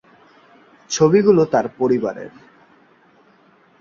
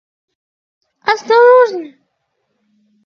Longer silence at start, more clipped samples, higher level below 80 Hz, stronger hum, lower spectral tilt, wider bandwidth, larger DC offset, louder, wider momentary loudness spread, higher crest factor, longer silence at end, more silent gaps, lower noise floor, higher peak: second, 0.9 s vs 1.05 s; neither; first, -60 dBFS vs -66 dBFS; neither; first, -5.5 dB/octave vs -2.5 dB/octave; first, 7.6 kHz vs 6.8 kHz; neither; second, -17 LUFS vs -11 LUFS; about the same, 16 LU vs 14 LU; about the same, 18 dB vs 16 dB; first, 1.5 s vs 1.2 s; neither; second, -54 dBFS vs -68 dBFS; about the same, -2 dBFS vs 0 dBFS